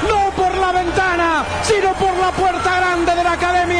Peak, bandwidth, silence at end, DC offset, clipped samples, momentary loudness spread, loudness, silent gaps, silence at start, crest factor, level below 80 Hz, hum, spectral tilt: -4 dBFS; 10.5 kHz; 0 s; under 0.1%; under 0.1%; 2 LU; -16 LUFS; none; 0 s; 12 dB; -34 dBFS; none; -4 dB/octave